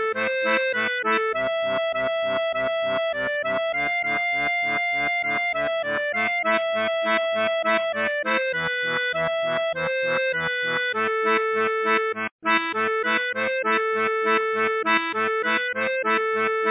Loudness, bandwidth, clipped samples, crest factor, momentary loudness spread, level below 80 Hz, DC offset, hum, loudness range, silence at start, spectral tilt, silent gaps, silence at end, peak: -23 LUFS; 4 kHz; under 0.1%; 16 dB; 3 LU; -64 dBFS; under 0.1%; none; 1 LU; 0 s; -6.5 dB/octave; 12.31-12.39 s; 0 s; -8 dBFS